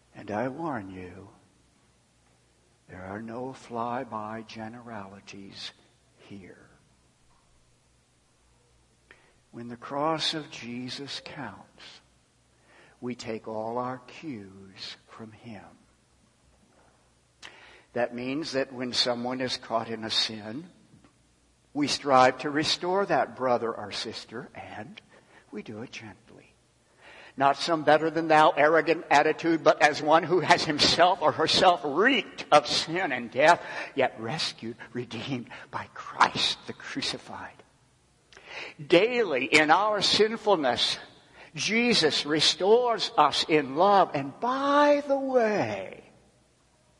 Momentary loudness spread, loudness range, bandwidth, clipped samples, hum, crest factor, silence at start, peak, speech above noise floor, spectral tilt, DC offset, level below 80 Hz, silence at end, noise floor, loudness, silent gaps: 21 LU; 17 LU; 11.5 kHz; under 0.1%; none; 24 dB; 0.15 s; -4 dBFS; 39 dB; -3.5 dB/octave; under 0.1%; -68 dBFS; 1 s; -65 dBFS; -25 LUFS; none